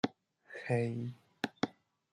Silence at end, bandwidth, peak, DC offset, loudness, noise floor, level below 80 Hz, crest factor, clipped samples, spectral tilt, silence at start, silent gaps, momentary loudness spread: 0.4 s; 11 kHz; -16 dBFS; under 0.1%; -38 LUFS; -56 dBFS; -78 dBFS; 22 dB; under 0.1%; -6.5 dB/octave; 0.05 s; none; 12 LU